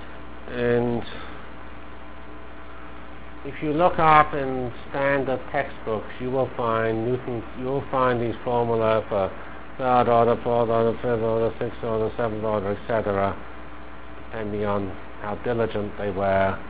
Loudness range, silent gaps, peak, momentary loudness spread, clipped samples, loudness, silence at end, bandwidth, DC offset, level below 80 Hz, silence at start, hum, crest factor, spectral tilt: 6 LU; none; 0 dBFS; 21 LU; under 0.1%; -24 LUFS; 0 s; 4 kHz; 2%; -44 dBFS; 0 s; none; 24 dB; -10.5 dB/octave